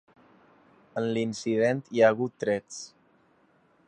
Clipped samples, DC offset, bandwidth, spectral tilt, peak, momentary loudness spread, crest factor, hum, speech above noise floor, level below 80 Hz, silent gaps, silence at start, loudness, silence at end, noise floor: under 0.1%; under 0.1%; 9.4 kHz; -5.5 dB/octave; -8 dBFS; 18 LU; 22 dB; none; 38 dB; -72 dBFS; none; 0.95 s; -27 LUFS; 1 s; -64 dBFS